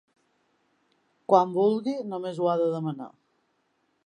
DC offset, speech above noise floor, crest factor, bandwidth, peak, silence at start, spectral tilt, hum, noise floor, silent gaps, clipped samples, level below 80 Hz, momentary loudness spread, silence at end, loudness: under 0.1%; 47 dB; 22 dB; 10 kHz; -6 dBFS; 1.3 s; -8 dB/octave; 50 Hz at -60 dBFS; -72 dBFS; none; under 0.1%; -82 dBFS; 17 LU; 0.95 s; -26 LUFS